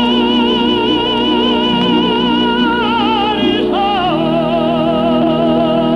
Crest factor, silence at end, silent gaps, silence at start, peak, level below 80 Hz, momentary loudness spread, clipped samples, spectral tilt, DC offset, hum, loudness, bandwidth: 12 dB; 0 s; none; 0 s; -2 dBFS; -38 dBFS; 2 LU; under 0.1%; -6.5 dB/octave; under 0.1%; 60 Hz at -25 dBFS; -13 LUFS; 6.8 kHz